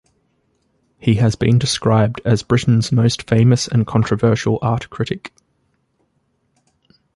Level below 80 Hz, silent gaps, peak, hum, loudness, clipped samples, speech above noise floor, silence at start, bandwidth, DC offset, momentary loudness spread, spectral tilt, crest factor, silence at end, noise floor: -44 dBFS; none; -2 dBFS; none; -17 LUFS; under 0.1%; 50 dB; 1.05 s; 11.5 kHz; under 0.1%; 9 LU; -6 dB/octave; 16 dB; 1.9 s; -65 dBFS